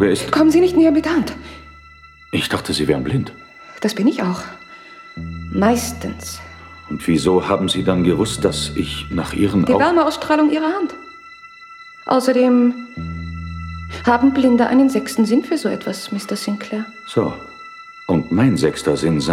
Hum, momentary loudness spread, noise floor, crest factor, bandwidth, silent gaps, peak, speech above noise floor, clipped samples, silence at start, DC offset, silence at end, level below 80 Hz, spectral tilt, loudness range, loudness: none; 22 LU; -44 dBFS; 16 dB; 15.5 kHz; none; -2 dBFS; 27 dB; under 0.1%; 0 s; under 0.1%; 0 s; -42 dBFS; -5.5 dB/octave; 5 LU; -17 LUFS